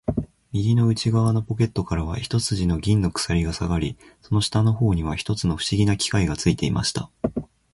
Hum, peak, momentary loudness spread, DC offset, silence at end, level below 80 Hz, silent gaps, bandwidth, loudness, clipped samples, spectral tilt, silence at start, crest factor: none; -4 dBFS; 8 LU; under 0.1%; 0.3 s; -36 dBFS; none; 11.5 kHz; -23 LUFS; under 0.1%; -5.5 dB/octave; 0.1 s; 18 dB